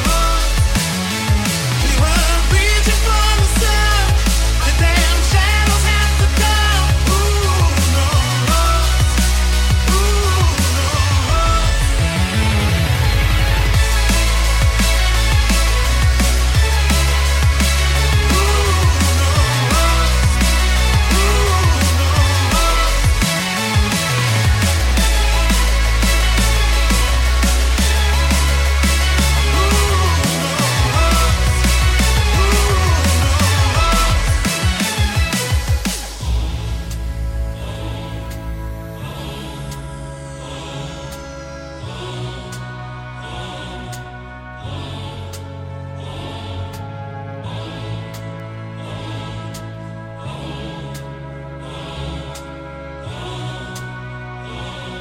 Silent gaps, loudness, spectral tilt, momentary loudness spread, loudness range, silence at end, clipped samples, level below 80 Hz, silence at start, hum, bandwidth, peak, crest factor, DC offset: none; -15 LUFS; -4 dB/octave; 16 LU; 15 LU; 0 s; under 0.1%; -18 dBFS; 0 s; none; 17 kHz; -2 dBFS; 14 dB; under 0.1%